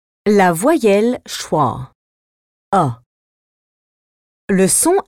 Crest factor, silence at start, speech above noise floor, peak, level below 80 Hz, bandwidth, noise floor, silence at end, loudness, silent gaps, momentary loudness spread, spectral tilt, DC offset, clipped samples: 16 dB; 0.25 s; over 76 dB; -2 dBFS; -52 dBFS; 17.5 kHz; under -90 dBFS; 0.05 s; -15 LUFS; 1.95-2.72 s, 3.06-4.48 s; 10 LU; -4.5 dB/octave; under 0.1%; under 0.1%